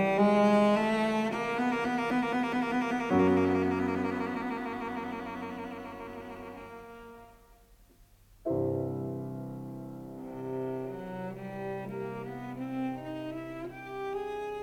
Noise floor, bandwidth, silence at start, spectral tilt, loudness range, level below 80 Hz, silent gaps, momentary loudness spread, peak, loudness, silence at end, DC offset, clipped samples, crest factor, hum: -59 dBFS; 16 kHz; 0 s; -7 dB/octave; 12 LU; -60 dBFS; none; 17 LU; -12 dBFS; -31 LUFS; 0 s; under 0.1%; under 0.1%; 18 dB; none